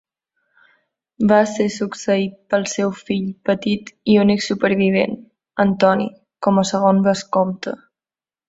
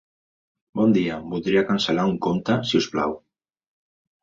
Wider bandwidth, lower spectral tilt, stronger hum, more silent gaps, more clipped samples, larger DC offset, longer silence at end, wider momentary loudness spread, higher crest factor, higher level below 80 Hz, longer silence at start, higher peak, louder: about the same, 8 kHz vs 7.6 kHz; about the same, -5.5 dB/octave vs -6 dB/octave; neither; neither; neither; neither; second, 0.7 s vs 1.05 s; about the same, 9 LU vs 8 LU; about the same, 18 dB vs 16 dB; about the same, -58 dBFS vs -56 dBFS; first, 1.2 s vs 0.75 s; first, -2 dBFS vs -8 dBFS; first, -18 LUFS vs -22 LUFS